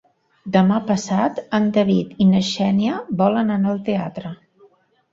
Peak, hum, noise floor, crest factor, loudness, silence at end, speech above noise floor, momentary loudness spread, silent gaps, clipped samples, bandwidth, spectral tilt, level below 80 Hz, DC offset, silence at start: -4 dBFS; none; -55 dBFS; 16 dB; -19 LUFS; 0.75 s; 37 dB; 8 LU; none; under 0.1%; 7.8 kHz; -6.5 dB/octave; -56 dBFS; under 0.1%; 0.45 s